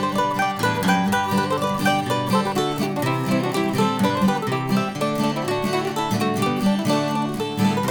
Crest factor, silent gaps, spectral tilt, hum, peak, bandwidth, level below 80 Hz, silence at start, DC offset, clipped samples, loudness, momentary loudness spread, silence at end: 16 dB; none; -5.5 dB/octave; none; -6 dBFS; over 20 kHz; -54 dBFS; 0 s; under 0.1%; under 0.1%; -21 LUFS; 3 LU; 0 s